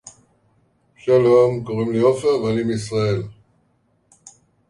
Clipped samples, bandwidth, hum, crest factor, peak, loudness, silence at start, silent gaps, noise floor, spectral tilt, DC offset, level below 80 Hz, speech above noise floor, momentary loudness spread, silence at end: under 0.1%; 11.5 kHz; none; 16 dB; -4 dBFS; -19 LUFS; 0.05 s; none; -63 dBFS; -7 dB/octave; under 0.1%; -54 dBFS; 46 dB; 11 LU; 1.4 s